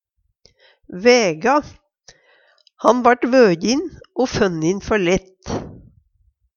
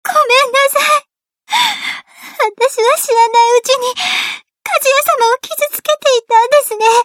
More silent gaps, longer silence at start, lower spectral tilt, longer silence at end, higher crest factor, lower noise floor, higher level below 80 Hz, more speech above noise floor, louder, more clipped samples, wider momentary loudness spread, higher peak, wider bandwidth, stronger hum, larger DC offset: neither; first, 0.9 s vs 0.05 s; first, -4.5 dB/octave vs 1.5 dB/octave; first, 0.8 s vs 0 s; first, 20 dB vs 12 dB; first, -62 dBFS vs -49 dBFS; first, -46 dBFS vs -72 dBFS; first, 45 dB vs 37 dB; second, -17 LUFS vs -12 LUFS; neither; first, 15 LU vs 8 LU; about the same, 0 dBFS vs 0 dBFS; second, 7.4 kHz vs 19.5 kHz; neither; neither